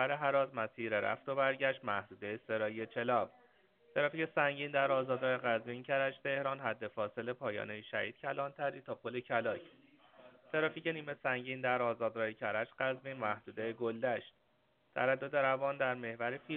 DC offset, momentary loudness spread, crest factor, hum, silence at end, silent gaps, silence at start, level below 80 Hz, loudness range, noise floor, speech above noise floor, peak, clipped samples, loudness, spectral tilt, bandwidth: under 0.1%; 7 LU; 20 dB; none; 0 s; none; 0 s; -82 dBFS; 4 LU; -75 dBFS; 38 dB; -16 dBFS; under 0.1%; -37 LUFS; -3 dB/octave; 4.3 kHz